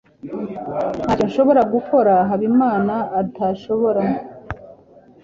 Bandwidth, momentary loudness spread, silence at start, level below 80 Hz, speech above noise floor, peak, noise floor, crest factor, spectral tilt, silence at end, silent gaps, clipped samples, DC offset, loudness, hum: 7.4 kHz; 16 LU; 0.25 s; -48 dBFS; 30 dB; -4 dBFS; -47 dBFS; 16 dB; -8.5 dB/octave; 0.5 s; none; under 0.1%; under 0.1%; -18 LUFS; none